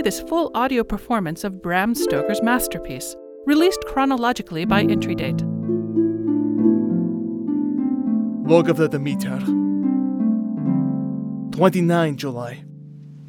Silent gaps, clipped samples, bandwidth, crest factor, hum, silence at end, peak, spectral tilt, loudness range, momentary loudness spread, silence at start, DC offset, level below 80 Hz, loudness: none; under 0.1%; 18 kHz; 18 dB; none; 0 s; -2 dBFS; -6 dB/octave; 2 LU; 10 LU; 0 s; under 0.1%; -48 dBFS; -21 LUFS